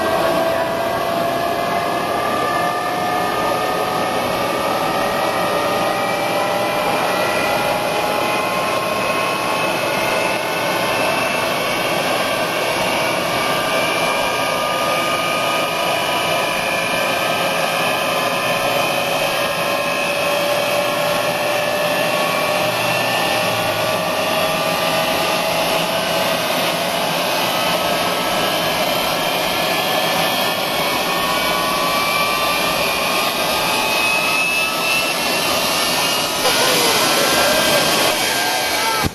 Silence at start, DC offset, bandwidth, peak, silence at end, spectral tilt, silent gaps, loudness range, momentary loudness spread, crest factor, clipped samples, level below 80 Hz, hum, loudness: 0 s; under 0.1%; 16 kHz; -2 dBFS; 0 s; -2.5 dB/octave; none; 3 LU; 4 LU; 16 dB; under 0.1%; -48 dBFS; none; -17 LUFS